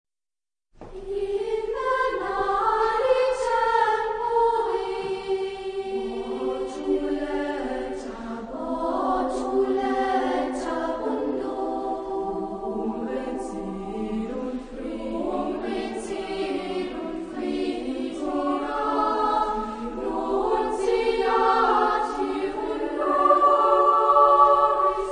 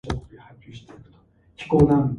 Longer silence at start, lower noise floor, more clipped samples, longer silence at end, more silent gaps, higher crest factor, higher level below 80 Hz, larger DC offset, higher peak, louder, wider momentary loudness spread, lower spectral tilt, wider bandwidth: first, 0.8 s vs 0.05 s; first, under -90 dBFS vs -56 dBFS; neither; about the same, 0 s vs 0 s; neither; about the same, 20 dB vs 20 dB; second, -48 dBFS vs -40 dBFS; neither; about the same, -6 dBFS vs -4 dBFS; second, -24 LUFS vs -21 LUFS; second, 13 LU vs 27 LU; second, -5 dB/octave vs -9 dB/octave; about the same, 10.5 kHz vs 10.5 kHz